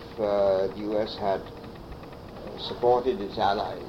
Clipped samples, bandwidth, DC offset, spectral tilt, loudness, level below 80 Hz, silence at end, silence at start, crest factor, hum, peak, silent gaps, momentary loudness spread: under 0.1%; 16 kHz; under 0.1%; -6.5 dB/octave; -27 LUFS; -50 dBFS; 0 s; 0 s; 16 dB; none; -10 dBFS; none; 19 LU